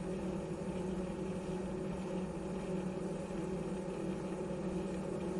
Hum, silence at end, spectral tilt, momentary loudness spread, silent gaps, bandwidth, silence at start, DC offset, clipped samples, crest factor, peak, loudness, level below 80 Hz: none; 0 s; -7 dB/octave; 1 LU; none; 11.5 kHz; 0 s; under 0.1%; under 0.1%; 12 dB; -28 dBFS; -40 LUFS; -56 dBFS